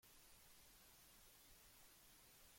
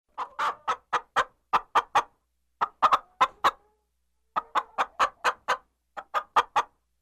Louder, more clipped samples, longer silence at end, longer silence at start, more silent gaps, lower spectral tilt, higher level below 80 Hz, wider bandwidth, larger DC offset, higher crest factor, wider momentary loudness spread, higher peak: second, -66 LUFS vs -27 LUFS; neither; second, 0 s vs 0.35 s; second, 0 s vs 0.2 s; neither; about the same, -1.5 dB/octave vs -1.5 dB/octave; second, -78 dBFS vs -64 dBFS; about the same, 16.5 kHz vs 15 kHz; neither; about the same, 14 dB vs 18 dB; second, 0 LU vs 10 LU; second, -54 dBFS vs -10 dBFS